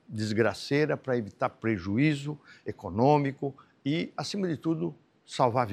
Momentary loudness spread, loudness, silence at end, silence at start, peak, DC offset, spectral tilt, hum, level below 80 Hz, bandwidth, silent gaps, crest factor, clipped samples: 12 LU; -29 LUFS; 0 s; 0.1 s; -10 dBFS; under 0.1%; -6.5 dB/octave; none; -68 dBFS; 12.5 kHz; none; 18 dB; under 0.1%